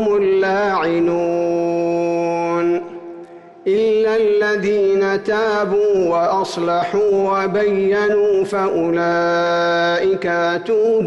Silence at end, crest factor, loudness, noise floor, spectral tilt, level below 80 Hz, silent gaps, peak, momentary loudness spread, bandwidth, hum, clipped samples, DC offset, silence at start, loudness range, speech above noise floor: 0 s; 8 dB; -17 LUFS; -38 dBFS; -6 dB/octave; -56 dBFS; none; -10 dBFS; 4 LU; 11 kHz; none; under 0.1%; under 0.1%; 0 s; 2 LU; 22 dB